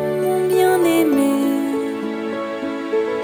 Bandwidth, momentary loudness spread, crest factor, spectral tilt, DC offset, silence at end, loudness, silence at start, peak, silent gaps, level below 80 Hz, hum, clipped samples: 19 kHz; 9 LU; 14 dB; -5 dB/octave; under 0.1%; 0 s; -19 LUFS; 0 s; -4 dBFS; none; -62 dBFS; none; under 0.1%